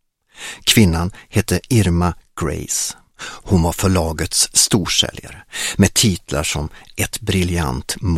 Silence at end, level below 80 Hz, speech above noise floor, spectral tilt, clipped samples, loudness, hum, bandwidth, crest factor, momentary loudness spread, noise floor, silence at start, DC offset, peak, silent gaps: 0 s; -34 dBFS; 19 dB; -3.5 dB/octave; under 0.1%; -17 LUFS; none; 16.5 kHz; 18 dB; 13 LU; -37 dBFS; 0.4 s; under 0.1%; 0 dBFS; none